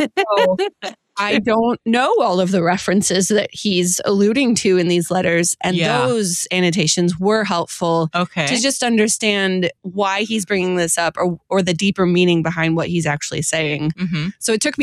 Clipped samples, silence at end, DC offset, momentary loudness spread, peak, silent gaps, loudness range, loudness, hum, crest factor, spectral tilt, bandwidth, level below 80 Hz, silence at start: under 0.1%; 0 s; under 0.1%; 5 LU; -4 dBFS; none; 2 LU; -17 LUFS; none; 14 dB; -4 dB/octave; 14.5 kHz; -54 dBFS; 0 s